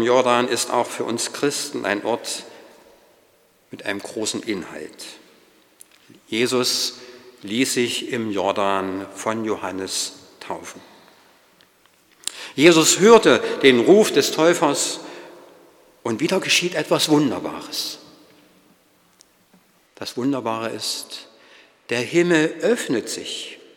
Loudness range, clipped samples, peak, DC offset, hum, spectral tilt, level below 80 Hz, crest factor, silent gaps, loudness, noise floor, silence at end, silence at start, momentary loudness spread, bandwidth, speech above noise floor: 14 LU; under 0.1%; 0 dBFS; under 0.1%; none; -3 dB/octave; -68 dBFS; 22 dB; none; -20 LUFS; -58 dBFS; 0.2 s; 0 s; 19 LU; 19 kHz; 38 dB